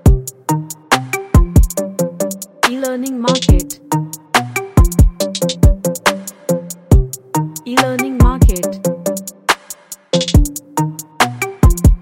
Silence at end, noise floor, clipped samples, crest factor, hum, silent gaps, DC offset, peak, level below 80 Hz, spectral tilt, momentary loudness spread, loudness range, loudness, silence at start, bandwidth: 0 s; -34 dBFS; under 0.1%; 14 dB; none; none; under 0.1%; 0 dBFS; -18 dBFS; -5 dB/octave; 8 LU; 2 LU; -16 LUFS; 0.05 s; 17 kHz